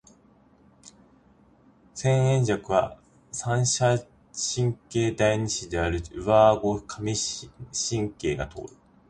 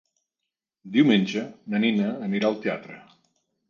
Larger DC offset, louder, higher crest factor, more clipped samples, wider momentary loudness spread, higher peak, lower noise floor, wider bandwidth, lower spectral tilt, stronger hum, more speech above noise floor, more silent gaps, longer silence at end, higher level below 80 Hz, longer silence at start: neither; about the same, -25 LUFS vs -24 LUFS; about the same, 20 dB vs 18 dB; neither; about the same, 14 LU vs 12 LU; about the same, -6 dBFS vs -6 dBFS; second, -58 dBFS vs -85 dBFS; first, 10.5 kHz vs 7.2 kHz; second, -4.5 dB/octave vs -6.5 dB/octave; neither; second, 33 dB vs 62 dB; neither; second, 0.4 s vs 0.7 s; first, -48 dBFS vs -72 dBFS; about the same, 0.85 s vs 0.85 s